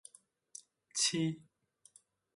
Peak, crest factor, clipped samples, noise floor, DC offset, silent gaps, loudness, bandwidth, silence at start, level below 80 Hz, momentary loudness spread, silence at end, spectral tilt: -20 dBFS; 22 dB; under 0.1%; -66 dBFS; under 0.1%; none; -34 LUFS; 11.5 kHz; 0.95 s; -82 dBFS; 22 LU; 0.95 s; -3 dB/octave